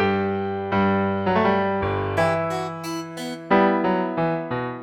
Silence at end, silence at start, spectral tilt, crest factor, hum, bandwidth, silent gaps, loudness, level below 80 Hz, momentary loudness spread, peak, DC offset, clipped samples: 0 s; 0 s; -6.5 dB/octave; 16 dB; none; 15.5 kHz; none; -23 LUFS; -52 dBFS; 10 LU; -6 dBFS; under 0.1%; under 0.1%